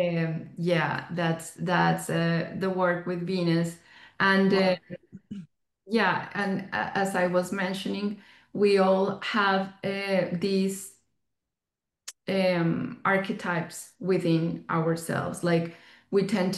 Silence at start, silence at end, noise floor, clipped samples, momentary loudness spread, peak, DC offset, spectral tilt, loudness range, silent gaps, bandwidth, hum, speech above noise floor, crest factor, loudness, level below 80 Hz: 0 s; 0 s; -89 dBFS; under 0.1%; 15 LU; -10 dBFS; under 0.1%; -6 dB/octave; 3 LU; none; 12.5 kHz; none; 62 dB; 18 dB; -27 LUFS; -68 dBFS